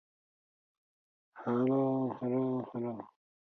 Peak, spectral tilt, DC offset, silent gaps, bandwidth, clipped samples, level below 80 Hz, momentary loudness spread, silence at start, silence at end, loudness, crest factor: -20 dBFS; -11 dB/octave; under 0.1%; none; 4 kHz; under 0.1%; -80 dBFS; 13 LU; 1.35 s; 0.45 s; -33 LUFS; 16 dB